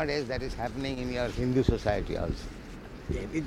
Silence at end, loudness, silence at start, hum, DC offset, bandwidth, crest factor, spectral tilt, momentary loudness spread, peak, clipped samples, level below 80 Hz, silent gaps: 0 s; -31 LUFS; 0 s; none; under 0.1%; 15 kHz; 22 dB; -6.5 dB/octave; 16 LU; -10 dBFS; under 0.1%; -40 dBFS; none